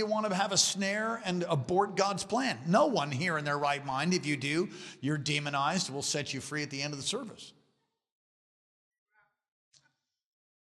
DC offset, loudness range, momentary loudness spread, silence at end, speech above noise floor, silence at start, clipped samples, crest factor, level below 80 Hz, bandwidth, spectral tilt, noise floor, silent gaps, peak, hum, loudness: under 0.1%; 11 LU; 9 LU; 3.1 s; 46 dB; 0 s; under 0.1%; 20 dB; -72 dBFS; 14.5 kHz; -3.5 dB/octave; -77 dBFS; none; -12 dBFS; none; -31 LUFS